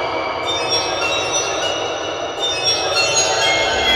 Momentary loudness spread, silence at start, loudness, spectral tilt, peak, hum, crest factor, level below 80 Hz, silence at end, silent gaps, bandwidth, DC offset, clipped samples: 7 LU; 0 s; -17 LUFS; -1 dB/octave; -2 dBFS; none; 16 dB; -44 dBFS; 0 s; none; 18 kHz; under 0.1%; under 0.1%